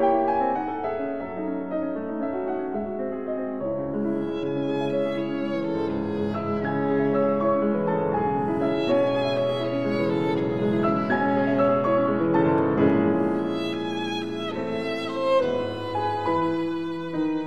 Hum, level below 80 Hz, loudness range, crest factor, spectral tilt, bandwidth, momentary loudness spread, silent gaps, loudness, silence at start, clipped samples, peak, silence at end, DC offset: none; -58 dBFS; 6 LU; 16 dB; -7.5 dB/octave; 8.8 kHz; 8 LU; none; -25 LUFS; 0 s; under 0.1%; -8 dBFS; 0 s; 0.5%